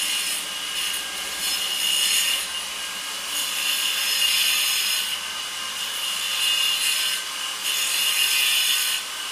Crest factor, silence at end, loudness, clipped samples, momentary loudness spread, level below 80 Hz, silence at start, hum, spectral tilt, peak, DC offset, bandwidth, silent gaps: 18 dB; 0 s; -21 LUFS; under 0.1%; 9 LU; -64 dBFS; 0 s; none; 3 dB/octave; -6 dBFS; under 0.1%; 16 kHz; none